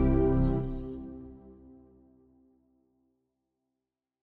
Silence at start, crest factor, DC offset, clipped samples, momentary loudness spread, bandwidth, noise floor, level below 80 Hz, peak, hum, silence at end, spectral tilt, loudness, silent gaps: 0 s; 18 dB; under 0.1%; under 0.1%; 26 LU; 3.8 kHz; -88 dBFS; -38 dBFS; -14 dBFS; none; 2.7 s; -12 dB/octave; -30 LUFS; none